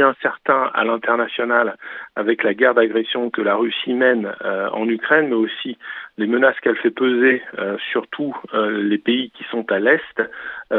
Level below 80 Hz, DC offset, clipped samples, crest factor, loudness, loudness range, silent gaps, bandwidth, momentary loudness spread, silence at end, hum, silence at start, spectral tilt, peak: -72 dBFS; under 0.1%; under 0.1%; 18 dB; -19 LUFS; 2 LU; none; 4.2 kHz; 10 LU; 0 s; none; 0 s; -7.5 dB/octave; -2 dBFS